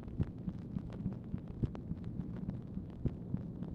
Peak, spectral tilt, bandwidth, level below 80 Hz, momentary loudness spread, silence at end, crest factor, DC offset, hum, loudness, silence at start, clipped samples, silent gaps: -22 dBFS; -10.5 dB/octave; 5.8 kHz; -50 dBFS; 4 LU; 0 s; 20 dB; under 0.1%; none; -42 LUFS; 0 s; under 0.1%; none